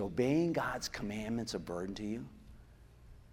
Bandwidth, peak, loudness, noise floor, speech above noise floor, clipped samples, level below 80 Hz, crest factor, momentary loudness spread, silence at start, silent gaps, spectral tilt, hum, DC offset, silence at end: 16 kHz; -18 dBFS; -37 LUFS; -58 dBFS; 22 dB; under 0.1%; -56 dBFS; 18 dB; 10 LU; 0 s; none; -5.5 dB/octave; none; under 0.1%; 0 s